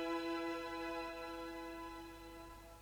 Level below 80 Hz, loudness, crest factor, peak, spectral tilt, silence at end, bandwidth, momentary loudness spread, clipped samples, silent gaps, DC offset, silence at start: -64 dBFS; -45 LUFS; 16 dB; -30 dBFS; -4.5 dB/octave; 0 s; over 20 kHz; 13 LU; under 0.1%; none; under 0.1%; 0 s